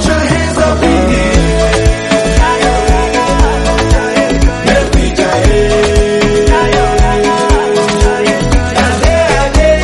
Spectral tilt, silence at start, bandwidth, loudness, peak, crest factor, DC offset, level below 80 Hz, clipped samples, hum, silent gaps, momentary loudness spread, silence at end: -5 dB/octave; 0 s; 12 kHz; -10 LUFS; 0 dBFS; 8 dB; under 0.1%; -14 dBFS; 0.2%; none; none; 2 LU; 0 s